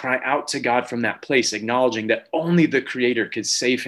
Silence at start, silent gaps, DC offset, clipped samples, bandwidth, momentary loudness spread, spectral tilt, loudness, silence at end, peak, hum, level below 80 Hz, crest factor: 0 s; none; under 0.1%; under 0.1%; 12.5 kHz; 4 LU; -4 dB/octave; -21 LUFS; 0 s; -4 dBFS; none; -68 dBFS; 16 dB